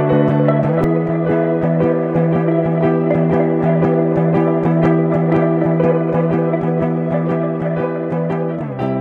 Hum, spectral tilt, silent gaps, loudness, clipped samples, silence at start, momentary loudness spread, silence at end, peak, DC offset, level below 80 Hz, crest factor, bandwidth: none; -11 dB/octave; none; -16 LUFS; under 0.1%; 0 s; 5 LU; 0 s; -2 dBFS; under 0.1%; -46 dBFS; 12 dB; 4 kHz